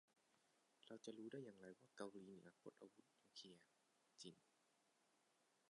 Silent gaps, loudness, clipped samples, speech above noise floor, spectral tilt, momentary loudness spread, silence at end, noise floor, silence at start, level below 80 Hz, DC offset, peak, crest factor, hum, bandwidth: none; -61 LUFS; under 0.1%; 23 dB; -4.5 dB/octave; 9 LU; 0.05 s; -84 dBFS; 0.1 s; under -90 dBFS; under 0.1%; -38 dBFS; 24 dB; none; 11 kHz